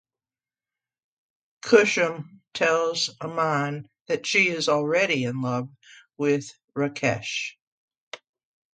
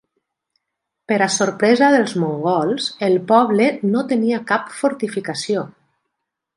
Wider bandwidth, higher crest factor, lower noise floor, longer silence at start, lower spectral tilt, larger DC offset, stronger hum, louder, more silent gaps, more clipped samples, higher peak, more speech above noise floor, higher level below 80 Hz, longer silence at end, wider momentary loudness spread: second, 9.4 kHz vs 11.5 kHz; first, 24 dB vs 16 dB; first, under -90 dBFS vs -79 dBFS; first, 1.65 s vs 1.1 s; about the same, -4 dB/octave vs -4.5 dB/octave; neither; neither; second, -24 LUFS vs -18 LUFS; first, 4.01-4.05 s, 6.64-6.68 s, 7.62-7.88 s, 8.00-8.11 s vs none; neither; about the same, -4 dBFS vs -2 dBFS; first, over 66 dB vs 62 dB; about the same, -70 dBFS vs -68 dBFS; second, 0.6 s vs 0.9 s; first, 18 LU vs 9 LU